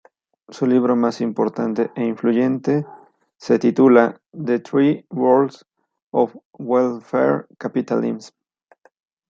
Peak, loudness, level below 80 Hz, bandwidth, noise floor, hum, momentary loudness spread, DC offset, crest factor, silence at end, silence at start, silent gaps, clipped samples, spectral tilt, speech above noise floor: -2 dBFS; -19 LUFS; -70 dBFS; 7.4 kHz; -56 dBFS; none; 10 LU; under 0.1%; 18 dB; 1 s; 0.5 s; 6.02-6.11 s, 6.45-6.51 s; under 0.1%; -7.5 dB/octave; 38 dB